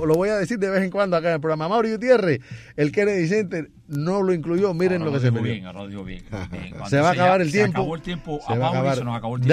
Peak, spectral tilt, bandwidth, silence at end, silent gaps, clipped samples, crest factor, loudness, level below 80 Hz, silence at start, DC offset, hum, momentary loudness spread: -4 dBFS; -7 dB/octave; 13.5 kHz; 0 s; none; under 0.1%; 18 dB; -22 LUFS; -50 dBFS; 0 s; under 0.1%; none; 15 LU